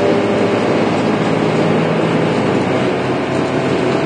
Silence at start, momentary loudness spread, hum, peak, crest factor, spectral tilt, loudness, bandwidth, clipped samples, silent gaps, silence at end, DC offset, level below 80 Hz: 0 s; 2 LU; none; -2 dBFS; 12 dB; -6.5 dB/octave; -15 LUFS; 10 kHz; under 0.1%; none; 0 s; under 0.1%; -50 dBFS